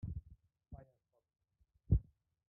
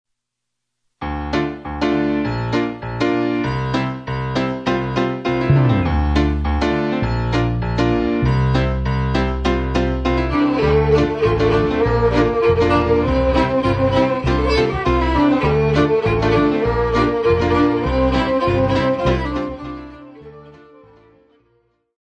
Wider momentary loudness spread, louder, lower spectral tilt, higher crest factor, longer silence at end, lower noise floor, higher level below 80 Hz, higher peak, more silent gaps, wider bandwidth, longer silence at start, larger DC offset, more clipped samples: first, 21 LU vs 6 LU; second, -39 LUFS vs -18 LUFS; first, -14.5 dB/octave vs -7.5 dB/octave; first, 24 dB vs 16 dB; second, 0.45 s vs 1.5 s; about the same, -79 dBFS vs -79 dBFS; second, -46 dBFS vs -28 dBFS; second, -18 dBFS vs -2 dBFS; neither; second, 1.8 kHz vs 9 kHz; second, 0.05 s vs 1 s; neither; neither